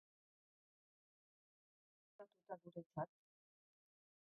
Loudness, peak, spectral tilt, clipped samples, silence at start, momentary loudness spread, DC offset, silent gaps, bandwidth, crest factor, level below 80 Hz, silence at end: -53 LUFS; -34 dBFS; -1.5 dB/octave; under 0.1%; 2.2 s; 15 LU; under 0.1%; 2.86-2.90 s; 1.8 kHz; 26 dB; under -90 dBFS; 1.25 s